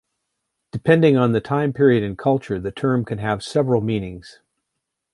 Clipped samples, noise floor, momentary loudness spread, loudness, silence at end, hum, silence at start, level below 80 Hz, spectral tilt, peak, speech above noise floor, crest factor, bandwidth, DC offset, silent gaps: under 0.1%; -79 dBFS; 11 LU; -19 LUFS; 0.85 s; none; 0.75 s; -50 dBFS; -7.5 dB/octave; -2 dBFS; 60 dB; 18 dB; 11.5 kHz; under 0.1%; none